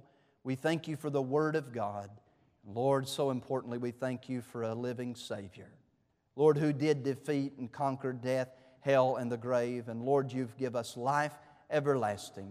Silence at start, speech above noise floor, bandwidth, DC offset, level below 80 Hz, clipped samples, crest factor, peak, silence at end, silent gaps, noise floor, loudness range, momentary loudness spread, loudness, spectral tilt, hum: 0.45 s; 42 dB; 15 kHz; under 0.1%; -78 dBFS; under 0.1%; 20 dB; -14 dBFS; 0 s; none; -75 dBFS; 3 LU; 11 LU; -34 LUFS; -6.5 dB/octave; none